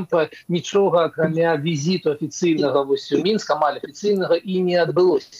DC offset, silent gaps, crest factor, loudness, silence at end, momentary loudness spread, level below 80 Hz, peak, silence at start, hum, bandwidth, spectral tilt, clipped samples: under 0.1%; none; 14 dB; -20 LUFS; 0 s; 5 LU; -68 dBFS; -4 dBFS; 0 s; none; 10.5 kHz; -5.5 dB/octave; under 0.1%